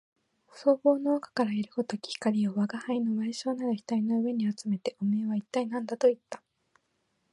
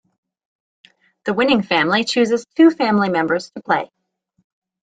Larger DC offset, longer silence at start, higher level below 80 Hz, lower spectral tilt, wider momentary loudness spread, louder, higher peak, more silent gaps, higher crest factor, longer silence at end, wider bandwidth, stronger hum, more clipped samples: neither; second, 0.55 s vs 1.25 s; second, -82 dBFS vs -62 dBFS; first, -6.5 dB/octave vs -5 dB/octave; about the same, 8 LU vs 9 LU; second, -30 LUFS vs -17 LUFS; second, -10 dBFS vs -2 dBFS; neither; about the same, 18 dB vs 18 dB; about the same, 0.95 s vs 1.05 s; first, 11 kHz vs 9.2 kHz; neither; neither